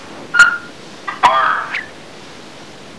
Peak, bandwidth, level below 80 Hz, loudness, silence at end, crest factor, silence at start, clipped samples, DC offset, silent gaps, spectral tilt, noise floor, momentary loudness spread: 0 dBFS; 11 kHz; -54 dBFS; -14 LUFS; 0.05 s; 18 dB; 0 s; 0.3%; 0.8%; none; -1.5 dB/octave; -36 dBFS; 24 LU